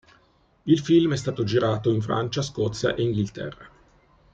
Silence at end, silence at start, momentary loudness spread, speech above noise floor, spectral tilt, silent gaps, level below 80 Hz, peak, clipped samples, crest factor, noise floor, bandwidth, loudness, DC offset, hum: 0.65 s; 0.65 s; 11 LU; 38 dB; -6.5 dB/octave; none; -54 dBFS; -6 dBFS; under 0.1%; 18 dB; -61 dBFS; 8 kHz; -24 LUFS; under 0.1%; none